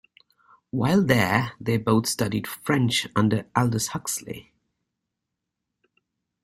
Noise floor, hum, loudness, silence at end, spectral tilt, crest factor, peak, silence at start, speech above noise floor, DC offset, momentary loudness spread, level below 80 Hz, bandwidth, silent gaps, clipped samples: -83 dBFS; none; -24 LUFS; 2 s; -5 dB/octave; 22 dB; -4 dBFS; 0.75 s; 60 dB; under 0.1%; 10 LU; -56 dBFS; 16 kHz; none; under 0.1%